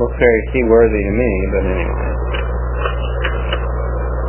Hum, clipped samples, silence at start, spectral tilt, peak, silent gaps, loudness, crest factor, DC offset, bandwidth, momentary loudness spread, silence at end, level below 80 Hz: 60 Hz at -20 dBFS; under 0.1%; 0 s; -11 dB/octave; 0 dBFS; none; -17 LUFS; 16 dB; 0.1%; 3.2 kHz; 9 LU; 0 s; -20 dBFS